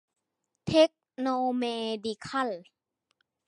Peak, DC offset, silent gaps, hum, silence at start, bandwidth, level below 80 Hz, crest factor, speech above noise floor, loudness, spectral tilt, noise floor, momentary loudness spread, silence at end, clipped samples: -8 dBFS; under 0.1%; none; none; 0.65 s; 11 kHz; -66 dBFS; 22 dB; 52 dB; -29 LUFS; -5 dB/octave; -83 dBFS; 11 LU; 0.85 s; under 0.1%